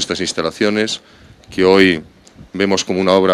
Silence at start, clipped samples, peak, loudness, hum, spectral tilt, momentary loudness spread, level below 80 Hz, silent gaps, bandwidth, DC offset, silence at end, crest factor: 0 s; under 0.1%; 0 dBFS; -15 LUFS; none; -4 dB/octave; 13 LU; -50 dBFS; none; 13 kHz; under 0.1%; 0 s; 16 dB